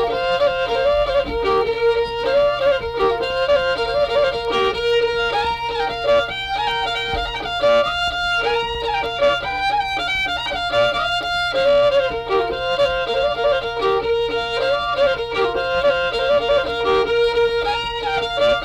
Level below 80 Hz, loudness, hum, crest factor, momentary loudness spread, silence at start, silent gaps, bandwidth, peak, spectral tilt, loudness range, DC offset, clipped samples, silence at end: -40 dBFS; -19 LUFS; none; 10 dB; 4 LU; 0 s; none; 12 kHz; -8 dBFS; -4 dB/octave; 1 LU; under 0.1%; under 0.1%; 0 s